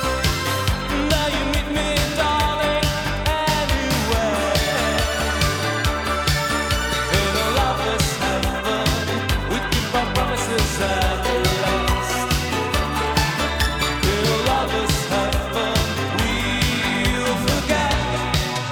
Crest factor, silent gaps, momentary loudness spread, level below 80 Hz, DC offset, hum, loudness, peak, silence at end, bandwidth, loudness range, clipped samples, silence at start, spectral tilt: 16 dB; none; 2 LU; -28 dBFS; under 0.1%; none; -20 LUFS; -4 dBFS; 0 s; over 20 kHz; 1 LU; under 0.1%; 0 s; -4 dB/octave